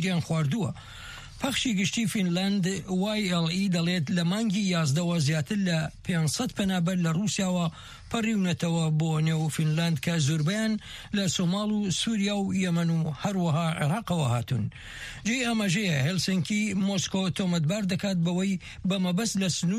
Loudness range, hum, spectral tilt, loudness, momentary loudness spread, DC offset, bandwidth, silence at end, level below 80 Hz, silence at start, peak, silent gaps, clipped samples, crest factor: 1 LU; none; -5 dB/octave; -27 LUFS; 5 LU; under 0.1%; 14.5 kHz; 0 s; -54 dBFS; 0 s; -14 dBFS; none; under 0.1%; 12 dB